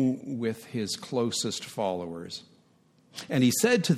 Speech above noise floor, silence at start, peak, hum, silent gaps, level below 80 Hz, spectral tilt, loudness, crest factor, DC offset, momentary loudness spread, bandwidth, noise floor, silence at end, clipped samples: 35 dB; 0 s; -10 dBFS; none; none; -72 dBFS; -4.5 dB/octave; -29 LUFS; 20 dB; under 0.1%; 17 LU; 15.5 kHz; -63 dBFS; 0 s; under 0.1%